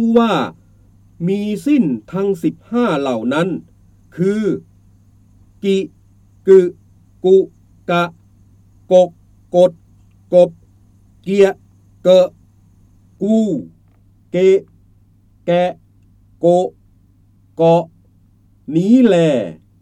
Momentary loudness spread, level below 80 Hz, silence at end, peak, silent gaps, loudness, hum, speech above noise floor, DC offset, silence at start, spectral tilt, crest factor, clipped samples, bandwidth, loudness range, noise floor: 14 LU; -54 dBFS; 0.25 s; 0 dBFS; none; -16 LUFS; 50 Hz at -50 dBFS; 38 dB; under 0.1%; 0 s; -7.5 dB/octave; 16 dB; under 0.1%; 11 kHz; 4 LU; -51 dBFS